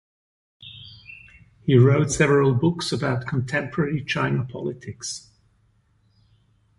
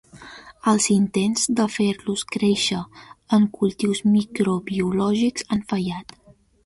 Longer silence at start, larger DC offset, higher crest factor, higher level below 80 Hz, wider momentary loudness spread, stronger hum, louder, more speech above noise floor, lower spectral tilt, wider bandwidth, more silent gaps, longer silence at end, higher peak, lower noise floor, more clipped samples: first, 0.6 s vs 0.15 s; neither; about the same, 18 dB vs 16 dB; about the same, -52 dBFS vs -56 dBFS; first, 24 LU vs 11 LU; neither; about the same, -22 LUFS vs -22 LUFS; first, 42 dB vs 22 dB; first, -6 dB/octave vs -4.5 dB/octave; about the same, 11.5 kHz vs 11.5 kHz; neither; first, 1.6 s vs 0.6 s; about the same, -6 dBFS vs -6 dBFS; first, -63 dBFS vs -43 dBFS; neither